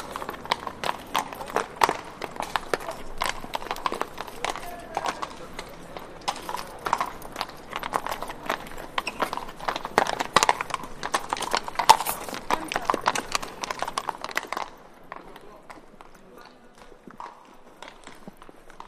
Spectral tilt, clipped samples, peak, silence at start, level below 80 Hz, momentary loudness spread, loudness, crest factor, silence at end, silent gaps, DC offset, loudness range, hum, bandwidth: -2 dB/octave; under 0.1%; 0 dBFS; 0 s; -48 dBFS; 22 LU; -28 LUFS; 30 dB; 0 s; none; under 0.1%; 14 LU; none; 15.5 kHz